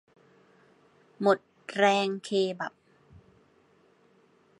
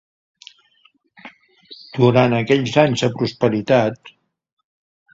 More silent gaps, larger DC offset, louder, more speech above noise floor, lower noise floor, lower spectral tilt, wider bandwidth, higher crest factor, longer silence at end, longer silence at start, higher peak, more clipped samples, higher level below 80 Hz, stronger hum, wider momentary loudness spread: neither; neither; second, -28 LUFS vs -17 LUFS; second, 37 dB vs 42 dB; first, -63 dBFS vs -59 dBFS; second, -4.5 dB/octave vs -6.5 dB/octave; first, 11.5 kHz vs 7.8 kHz; about the same, 24 dB vs 20 dB; first, 1.9 s vs 1.05 s; about the same, 1.2 s vs 1.25 s; second, -8 dBFS vs 0 dBFS; neither; second, -74 dBFS vs -56 dBFS; neither; first, 13 LU vs 9 LU